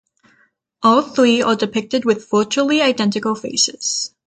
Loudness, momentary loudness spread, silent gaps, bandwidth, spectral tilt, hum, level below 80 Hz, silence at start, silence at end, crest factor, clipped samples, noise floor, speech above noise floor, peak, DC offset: -17 LUFS; 6 LU; none; 9.2 kHz; -3 dB/octave; none; -62 dBFS; 0.8 s; 0.2 s; 16 dB; under 0.1%; -59 dBFS; 43 dB; -2 dBFS; under 0.1%